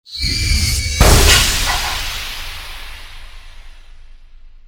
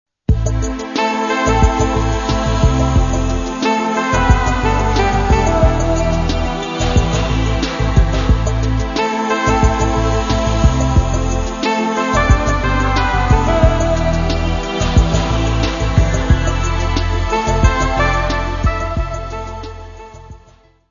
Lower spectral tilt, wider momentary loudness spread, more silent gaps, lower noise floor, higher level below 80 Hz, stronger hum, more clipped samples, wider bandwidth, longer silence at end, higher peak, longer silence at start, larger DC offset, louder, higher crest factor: second, -2.5 dB/octave vs -5.5 dB/octave; first, 21 LU vs 6 LU; neither; second, -38 dBFS vs -48 dBFS; about the same, -20 dBFS vs -18 dBFS; neither; neither; first, over 20 kHz vs 7.4 kHz; second, 0.1 s vs 0.55 s; about the same, 0 dBFS vs 0 dBFS; second, 0.1 s vs 0.3 s; neither; about the same, -14 LUFS vs -16 LUFS; about the same, 16 dB vs 14 dB